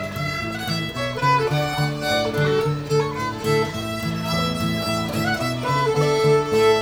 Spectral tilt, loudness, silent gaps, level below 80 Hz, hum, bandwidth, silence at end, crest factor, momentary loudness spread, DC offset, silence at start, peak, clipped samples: -5.5 dB/octave; -22 LUFS; none; -46 dBFS; none; over 20 kHz; 0 s; 14 dB; 7 LU; under 0.1%; 0 s; -6 dBFS; under 0.1%